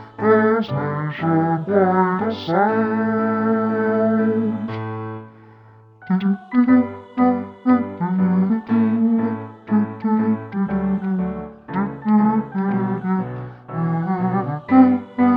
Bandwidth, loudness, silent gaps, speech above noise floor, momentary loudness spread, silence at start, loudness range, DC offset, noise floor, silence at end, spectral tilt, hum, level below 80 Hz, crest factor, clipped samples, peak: 5.4 kHz; -19 LUFS; none; 29 dB; 10 LU; 0 s; 3 LU; under 0.1%; -47 dBFS; 0 s; -10.5 dB/octave; none; -56 dBFS; 18 dB; under 0.1%; -2 dBFS